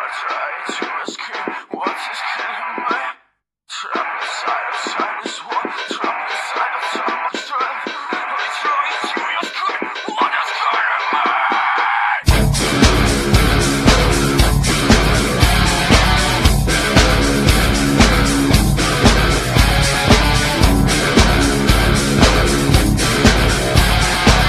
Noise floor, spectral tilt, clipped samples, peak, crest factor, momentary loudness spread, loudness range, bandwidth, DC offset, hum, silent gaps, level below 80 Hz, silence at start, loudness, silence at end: -61 dBFS; -4 dB/octave; under 0.1%; 0 dBFS; 16 dB; 10 LU; 9 LU; 14 kHz; under 0.1%; none; none; -22 dBFS; 0 s; -16 LUFS; 0 s